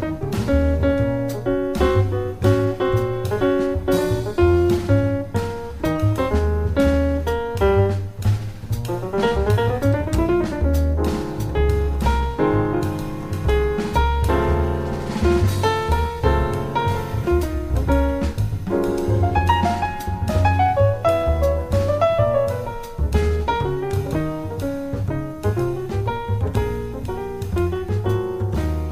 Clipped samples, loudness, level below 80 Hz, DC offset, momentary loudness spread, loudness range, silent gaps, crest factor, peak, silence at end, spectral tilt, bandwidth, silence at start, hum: under 0.1%; -21 LUFS; -26 dBFS; under 0.1%; 7 LU; 4 LU; none; 16 dB; -4 dBFS; 0 s; -7.5 dB/octave; 15.5 kHz; 0 s; none